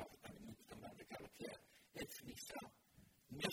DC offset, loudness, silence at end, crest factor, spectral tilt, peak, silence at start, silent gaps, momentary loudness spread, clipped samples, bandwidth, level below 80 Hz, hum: under 0.1%; -54 LUFS; 0 s; 28 dB; -3.5 dB/octave; -26 dBFS; 0 s; none; 7 LU; under 0.1%; over 20 kHz; -76 dBFS; none